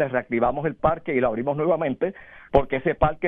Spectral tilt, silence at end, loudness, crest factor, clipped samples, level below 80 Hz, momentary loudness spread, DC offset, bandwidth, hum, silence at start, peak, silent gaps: -10 dB/octave; 0 s; -24 LUFS; 20 dB; under 0.1%; -40 dBFS; 4 LU; under 0.1%; 4.5 kHz; none; 0 s; -4 dBFS; none